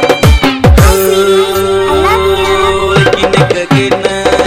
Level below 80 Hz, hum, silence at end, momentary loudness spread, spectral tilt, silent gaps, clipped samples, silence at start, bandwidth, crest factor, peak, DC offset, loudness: -18 dBFS; none; 0 s; 4 LU; -5 dB/octave; none; 1%; 0 s; 16.5 kHz; 8 dB; 0 dBFS; under 0.1%; -8 LUFS